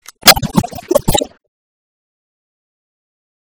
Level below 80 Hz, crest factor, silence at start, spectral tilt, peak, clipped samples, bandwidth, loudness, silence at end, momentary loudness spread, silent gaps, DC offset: -34 dBFS; 18 dB; 0.25 s; -2.5 dB/octave; 0 dBFS; 1%; over 20 kHz; -12 LUFS; 2.3 s; 10 LU; none; under 0.1%